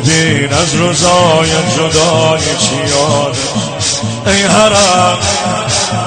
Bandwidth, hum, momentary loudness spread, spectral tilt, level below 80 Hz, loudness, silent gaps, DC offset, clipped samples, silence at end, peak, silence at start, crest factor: 9.6 kHz; none; 6 LU; -3.5 dB/octave; -36 dBFS; -10 LUFS; none; under 0.1%; under 0.1%; 0 s; 0 dBFS; 0 s; 10 dB